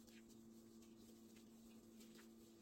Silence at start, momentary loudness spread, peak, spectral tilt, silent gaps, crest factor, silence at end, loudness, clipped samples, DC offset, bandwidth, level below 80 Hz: 0 s; 1 LU; -50 dBFS; -4 dB/octave; none; 14 dB; 0 s; -64 LUFS; under 0.1%; under 0.1%; 16.5 kHz; -84 dBFS